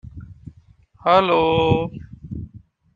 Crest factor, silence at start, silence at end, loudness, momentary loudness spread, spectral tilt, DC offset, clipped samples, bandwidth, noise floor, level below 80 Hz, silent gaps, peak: 20 dB; 0.05 s; 0.35 s; -18 LUFS; 24 LU; -8 dB/octave; under 0.1%; under 0.1%; 7.2 kHz; -52 dBFS; -46 dBFS; none; -2 dBFS